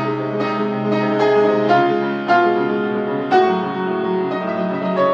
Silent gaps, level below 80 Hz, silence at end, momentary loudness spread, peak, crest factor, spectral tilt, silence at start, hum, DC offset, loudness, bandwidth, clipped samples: none; -70 dBFS; 0 s; 6 LU; -2 dBFS; 16 dB; -7.5 dB/octave; 0 s; none; under 0.1%; -18 LUFS; 7.4 kHz; under 0.1%